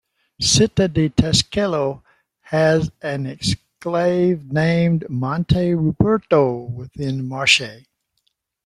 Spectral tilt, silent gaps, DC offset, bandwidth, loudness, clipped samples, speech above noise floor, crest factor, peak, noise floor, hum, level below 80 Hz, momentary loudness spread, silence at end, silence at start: -4.5 dB/octave; none; under 0.1%; 12.5 kHz; -19 LUFS; under 0.1%; 52 dB; 18 dB; 0 dBFS; -70 dBFS; none; -44 dBFS; 11 LU; 0.9 s; 0.4 s